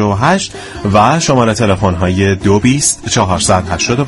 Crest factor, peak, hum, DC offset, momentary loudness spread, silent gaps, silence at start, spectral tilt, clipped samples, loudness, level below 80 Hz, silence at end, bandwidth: 12 dB; 0 dBFS; none; under 0.1%; 4 LU; none; 0 s; -4.5 dB/octave; 0.1%; -12 LUFS; -34 dBFS; 0 s; 12 kHz